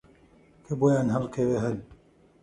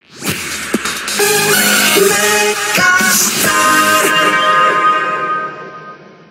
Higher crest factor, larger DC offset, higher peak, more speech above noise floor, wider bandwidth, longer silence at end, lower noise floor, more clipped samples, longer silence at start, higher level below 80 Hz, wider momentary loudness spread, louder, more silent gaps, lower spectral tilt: about the same, 16 dB vs 12 dB; neither; second, -12 dBFS vs 0 dBFS; first, 32 dB vs 23 dB; second, 11 kHz vs 16.5 kHz; first, 0.5 s vs 0.25 s; first, -57 dBFS vs -35 dBFS; neither; first, 0.7 s vs 0.15 s; about the same, -56 dBFS vs -52 dBFS; about the same, 12 LU vs 10 LU; second, -27 LUFS vs -11 LUFS; neither; first, -8 dB/octave vs -1.5 dB/octave